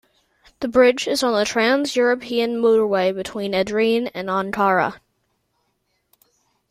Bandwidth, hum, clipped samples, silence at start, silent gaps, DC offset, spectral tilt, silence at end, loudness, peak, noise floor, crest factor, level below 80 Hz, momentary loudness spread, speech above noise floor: 15 kHz; none; under 0.1%; 0.6 s; none; under 0.1%; -4 dB/octave; 1.75 s; -19 LUFS; -4 dBFS; -70 dBFS; 16 dB; -58 dBFS; 8 LU; 51 dB